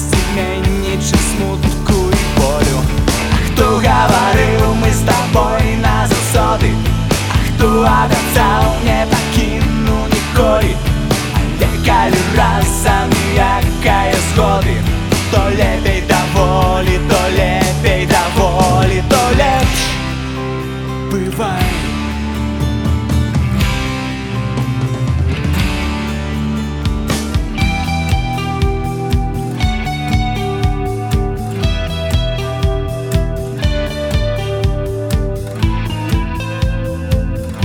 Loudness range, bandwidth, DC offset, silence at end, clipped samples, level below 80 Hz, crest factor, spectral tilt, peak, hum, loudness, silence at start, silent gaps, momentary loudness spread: 5 LU; 18 kHz; under 0.1%; 0 s; under 0.1%; -20 dBFS; 14 dB; -5 dB/octave; 0 dBFS; none; -15 LUFS; 0 s; none; 7 LU